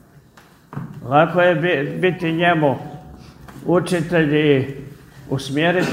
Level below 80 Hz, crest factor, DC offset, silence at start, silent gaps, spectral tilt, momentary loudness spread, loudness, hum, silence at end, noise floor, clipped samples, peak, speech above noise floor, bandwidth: -52 dBFS; 18 dB; under 0.1%; 0.7 s; none; -6.5 dB/octave; 19 LU; -18 LUFS; none; 0 s; -49 dBFS; under 0.1%; 0 dBFS; 32 dB; 16 kHz